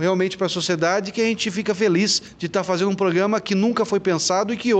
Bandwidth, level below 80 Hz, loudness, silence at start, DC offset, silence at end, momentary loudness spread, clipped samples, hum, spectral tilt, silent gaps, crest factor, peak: 9.2 kHz; -60 dBFS; -21 LUFS; 0 s; under 0.1%; 0 s; 4 LU; under 0.1%; none; -4 dB/octave; none; 14 dB; -6 dBFS